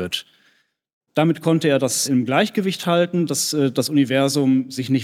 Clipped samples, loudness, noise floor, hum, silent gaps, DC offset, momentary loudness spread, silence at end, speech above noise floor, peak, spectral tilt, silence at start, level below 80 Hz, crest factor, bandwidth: under 0.1%; -19 LUFS; -62 dBFS; none; 0.93-1.01 s; under 0.1%; 5 LU; 0 s; 43 dB; -4 dBFS; -4.5 dB/octave; 0 s; -70 dBFS; 16 dB; 16.5 kHz